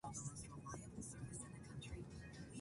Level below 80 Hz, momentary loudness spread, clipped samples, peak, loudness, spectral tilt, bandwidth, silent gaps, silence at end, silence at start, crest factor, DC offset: -64 dBFS; 5 LU; under 0.1%; -38 dBFS; -52 LUFS; -4.5 dB/octave; 11.5 kHz; none; 0 s; 0.05 s; 16 dB; under 0.1%